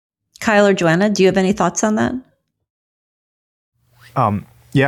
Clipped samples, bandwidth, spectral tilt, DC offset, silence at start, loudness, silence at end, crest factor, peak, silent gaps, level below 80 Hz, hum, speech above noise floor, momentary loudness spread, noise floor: under 0.1%; 13 kHz; -5.5 dB/octave; under 0.1%; 0.4 s; -16 LUFS; 0 s; 14 dB; -4 dBFS; 2.70-3.72 s; -52 dBFS; none; over 75 dB; 11 LU; under -90 dBFS